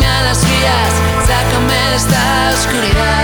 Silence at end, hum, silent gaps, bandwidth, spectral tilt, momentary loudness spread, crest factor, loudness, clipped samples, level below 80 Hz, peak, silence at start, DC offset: 0 s; none; none; over 20 kHz; -4 dB/octave; 2 LU; 10 dB; -12 LUFS; under 0.1%; -20 dBFS; -2 dBFS; 0 s; under 0.1%